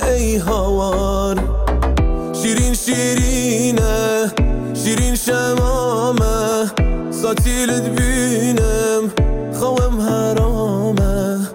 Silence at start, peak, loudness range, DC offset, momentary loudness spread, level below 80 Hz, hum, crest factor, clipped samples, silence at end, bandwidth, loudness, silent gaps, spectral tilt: 0 s; -6 dBFS; 1 LU; under 0.1%; 3 LU; -22 dBFS; none; 10 dB; under 0.1%; 0 s; 17 kHz; -17 LUFS; none; -5 dB/octave